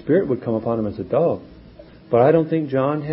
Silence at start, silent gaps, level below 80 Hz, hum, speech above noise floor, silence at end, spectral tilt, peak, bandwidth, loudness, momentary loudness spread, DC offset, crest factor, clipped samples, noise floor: 0.05 s; none; -50 dBFS; none; 25 dB; 0 s; -13 dB/octave; -2 dBFS; 5.6 kHz; -20 LUFS; 8 LU; under 0.1%; 18 dB; under 0.1%; -44 dBFS